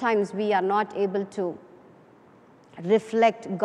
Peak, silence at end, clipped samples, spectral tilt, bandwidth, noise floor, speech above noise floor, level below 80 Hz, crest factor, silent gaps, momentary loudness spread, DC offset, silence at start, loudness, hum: -8 dBFS; 0 s; under 0.1%; -6 dB/octave; 10.5 kHz; -54 dBFS; 30 dB; -76 dBFS; 18 dB; none; 10 LU; under 0.1%; 0 s; -25 LUFS; none